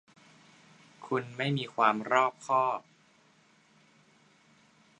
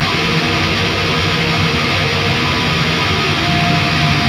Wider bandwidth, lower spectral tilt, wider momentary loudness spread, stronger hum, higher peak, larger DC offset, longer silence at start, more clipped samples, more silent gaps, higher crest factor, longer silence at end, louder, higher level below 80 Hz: second, 10.5 kHz vs 15.5 kHz; about the same, -5.5 dB/octave vs -4.5 dB/octave; first, 8 LU vs 1 LU; neither; second, -8 dBFS vs -2 dBFS; neither; first, 1 s vs 0 s; neither; neither; first, 26 dB vs 12 dB; first, 2.2 s vs 0 s; second, -29 LUFS vs -14 LUFS; second, -82 dBFS vs -34 dBFS